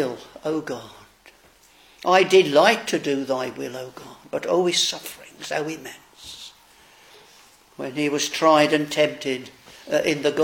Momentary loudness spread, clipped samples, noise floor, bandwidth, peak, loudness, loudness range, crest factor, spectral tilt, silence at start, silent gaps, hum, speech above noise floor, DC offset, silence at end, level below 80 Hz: 21 LU; under 0.1%; -54 dBFS; 17 kHz; -2 dBFS; -21 LUFS; 8 LU; 22 dB; -3.5 dB/octave; 0 s; none; none; 33 dB; under 0.1%; 0 s; -66 dBFS